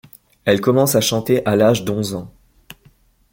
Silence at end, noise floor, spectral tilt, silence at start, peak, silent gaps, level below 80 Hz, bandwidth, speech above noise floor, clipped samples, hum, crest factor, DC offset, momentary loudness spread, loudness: 1.05 s; -54 dBFS; -5 dB/octave; 0.45 s; -2 dBFS; none; -52 dBFS; 17 kHz; 37 dB; under 0.1%; none; 18 dB; under 0.1%; 10 LU; -17 LUFS